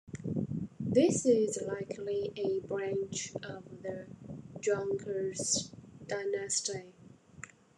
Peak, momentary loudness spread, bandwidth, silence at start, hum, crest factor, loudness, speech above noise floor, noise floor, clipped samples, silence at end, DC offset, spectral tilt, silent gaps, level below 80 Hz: -14 dBFS; 19 LU; 12 kHz; 0.05 s; none; 20 dB; -33 LUFS; 20 dB; -53 dBFS; under 0.1%; 0.3 s; under 0.1%; -4 dB/octave; none; -68 dBFS